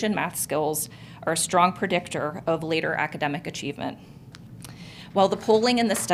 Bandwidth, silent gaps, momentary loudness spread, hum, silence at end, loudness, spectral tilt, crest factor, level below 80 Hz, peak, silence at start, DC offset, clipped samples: 16 kHz; none; 21 LU; none; 0 s; -25 LUFS; -3.5 dB/octave; 20 dB; -60 dBFS; -6 dBFS; 0 s; under 0.1%; under 0.1%